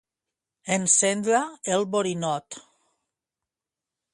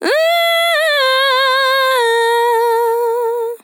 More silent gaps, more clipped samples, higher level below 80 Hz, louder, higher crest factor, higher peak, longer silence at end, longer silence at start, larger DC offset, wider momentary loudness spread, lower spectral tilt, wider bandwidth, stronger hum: neither; neither; first, -72 dBFS vs under -90 dBFS; second, -23 LUFS vs -13 LUFS; first, 22 dB vs 10 dB; about the same, -6 dBFS vs -4 dBFS; first, 1.55 s vs 0.05 s; first, 0.65 s vs 0 s; neither; first, 20 LU vs 4 LU; first, -3 dB/octave vs 1.5 dB/octave; second, 11.5 kHz vs 19 kHz; neither